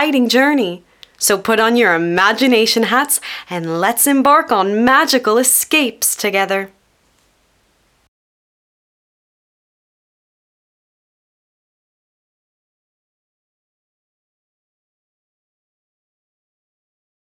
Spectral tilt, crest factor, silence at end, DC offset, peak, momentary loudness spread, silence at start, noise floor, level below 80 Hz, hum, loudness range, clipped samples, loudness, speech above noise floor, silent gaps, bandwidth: -2.5 dB/octave; 18 dB; 10.6 s; under 0.1%; 0 dBFS; 9 LU; 0 s; -59 dBFS; -62 dBFS; none; 9 LU; under 0.1%; -13 LUFS; 45 dB; none; 18.5 kHz